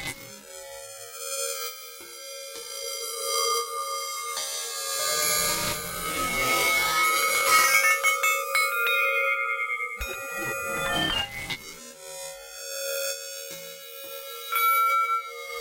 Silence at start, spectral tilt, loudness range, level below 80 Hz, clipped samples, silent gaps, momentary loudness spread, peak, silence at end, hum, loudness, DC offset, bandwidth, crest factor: 0 s; 0 dB/octave; 10 LU; -54 dBFS; under 0.1%; none; 18 LU; -6 dBFS; 0 s; none; -24 LUFS; under 0.1%; 16 kHz; 20 dB